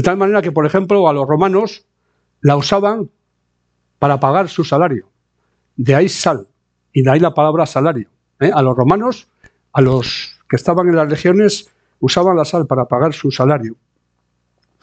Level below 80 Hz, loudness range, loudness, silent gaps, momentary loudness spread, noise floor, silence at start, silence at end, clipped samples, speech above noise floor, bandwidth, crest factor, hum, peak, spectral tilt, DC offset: -50 dBFS; 3 LU; -14 LUFS; none; 10 LU; -67 dBFS; 0 s; 1.1 s; under 0.1%; 54 dB; 8.8 kHz; 14 dB; 60 Hz at -45 dBFS; 0 dBFS; -6.5 dB/octave; under 0.1%